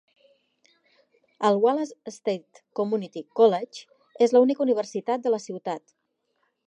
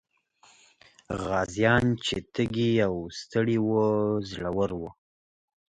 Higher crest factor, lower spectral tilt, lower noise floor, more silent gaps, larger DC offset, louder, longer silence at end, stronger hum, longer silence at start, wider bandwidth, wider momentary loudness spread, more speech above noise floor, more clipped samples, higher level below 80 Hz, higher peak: about the same, 18 dB vs 20 dB; about the same, -5.5 dB/octave vs -6 dB/octave; first, -74 dBFS vs -61 dBFS; neither; neither; about the same, -25 LUFS vs -27 LUFS; first, 0.9 s vs 0.75 s; neither; first, 1.4 s vs 1.1 s; about the same, 9 kHz vs 9.6 kHz; first, 14 LU vs 11 LU; first, 50 dB vs 35 dB; neither; second, -84 dBFS vs -52 dBFS; about the same, -8 dBFS vs -8 dBFS